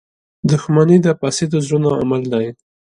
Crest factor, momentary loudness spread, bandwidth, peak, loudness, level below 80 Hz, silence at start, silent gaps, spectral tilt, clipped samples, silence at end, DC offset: 16 dB; 9 LU; 11.5 kHz; 0 dBFS; -16 LUFS; -52 dBFS; 0.45 s; none; -6.5 dB/octave; under 0.1%; 0.45 s; under 0.1%